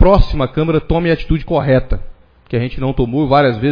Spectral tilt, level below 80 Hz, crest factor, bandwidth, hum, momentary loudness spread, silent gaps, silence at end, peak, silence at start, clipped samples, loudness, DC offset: -9.5 dB/octave; -22 dBFS; 14 dB; 5.2 kHz; none; 8 LU; none; 0 s; 0 dBFS; 0 s; under 0.1%; -15 LUFS; under 0.1%